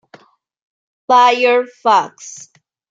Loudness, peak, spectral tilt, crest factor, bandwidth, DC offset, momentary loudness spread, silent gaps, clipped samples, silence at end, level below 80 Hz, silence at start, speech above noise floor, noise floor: -13 LUFS; 0 dBFS; -2 dB/octave; 16 dB; 7.8 kHz; under 0.1%; 22 LU; none; under 0.1%; 0.5 s; -76 dBFS; 1.1 s; 33 dB; -47 dBFS